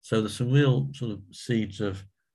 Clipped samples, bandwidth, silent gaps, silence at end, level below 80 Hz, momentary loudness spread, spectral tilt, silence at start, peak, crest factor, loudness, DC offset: under 0.1%; 12 kHz; none; 0.3 s; -56 dBFS; 14 LU; -7 dB/octave; 0.05 s; -10 dBFS; 18 dB; -27 LUFS; under 0.1%